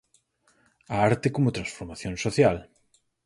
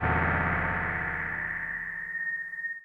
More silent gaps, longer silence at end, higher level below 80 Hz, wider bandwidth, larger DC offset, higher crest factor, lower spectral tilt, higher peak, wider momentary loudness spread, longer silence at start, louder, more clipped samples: neither; first, 0.65 s vs 0 s; second, -52 dBFS vs -44 dBFS; first, 11.5 kHz vs 4.8 kHz; neither; about the same, 20 dB vs 16 dB; second, -6 dB/octave vs -8.5 dB/octave; first, -8 dBFS vs -14 dBFS; first, 13 LU vs 7 LU; first, 0.9 s vs 0 s; first, -26 LUFS vs -29 LUFS; neither